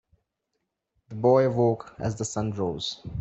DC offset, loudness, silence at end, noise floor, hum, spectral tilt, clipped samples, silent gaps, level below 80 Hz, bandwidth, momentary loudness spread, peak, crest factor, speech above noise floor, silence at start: under 0.1%; -26 LUFS; 0 s; -80 dBFS; none; -6 dB/octave; under 0.1%; none; -54 dBFS; 8.4 kHz; 11 LU; -8 dBFS; 18 dB; 55 dB; 1.1 s